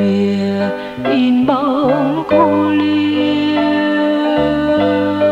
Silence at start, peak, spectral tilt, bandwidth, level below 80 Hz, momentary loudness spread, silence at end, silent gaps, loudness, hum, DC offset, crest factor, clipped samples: 0 s; -2 dBFS; -7.5 dB/octave; 7.8 kHz; -46 dBFS; 4 LU; 0 s; none; -14 LUFS; none; under 0.1%; 12 dB; under 0.1%